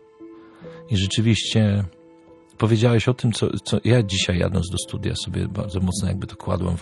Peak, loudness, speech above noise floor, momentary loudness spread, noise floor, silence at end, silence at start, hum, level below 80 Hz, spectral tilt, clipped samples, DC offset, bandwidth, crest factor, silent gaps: -4 dBFS; -22 LUFS; 28 dB; 8 LU; -49 dBFS; 0 s; 0.2 s; none; -44 dBFS; -5.5 dB/octave; under 0.1%; under 0.1%; 12 kHz; 18 dB; none